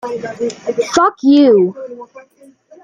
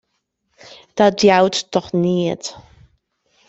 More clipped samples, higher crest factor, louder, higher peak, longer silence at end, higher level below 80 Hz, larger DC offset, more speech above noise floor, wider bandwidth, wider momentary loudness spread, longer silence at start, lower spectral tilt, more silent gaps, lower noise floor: neither; about the same, 14 dB vs 18 dB; first, -13 LUFS vs -17 LUFS; about the same, 0 dBFS vs 0 dBFS; second, 0.65 s vs 0.9 s; about the same, -58 dBFS vs -56 dBFS; neither; second, 31 dB vs 55 dB; first, 9.6 kHz vs 8.2 kHz; first, 21 LU vs 15 LU; second, 0.05 s vs 0.95 s; about the same, -5 dB/octave vs -5 dB/octave; neither; second, -44 dBFS vs -72 dBFS